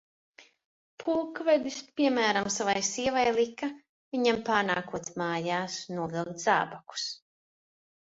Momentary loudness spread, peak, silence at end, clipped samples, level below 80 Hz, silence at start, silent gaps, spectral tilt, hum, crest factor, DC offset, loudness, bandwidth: 10 LU; -10 dBFS; 0.95 s; under 0.1%; -68 dBFS; 0.4 s; 0.65-0.98 s, 3.89-4.11 s; -3.5 dB/octave; none; 20 dB; under 0.1%; -29 LUFS; 8 kHz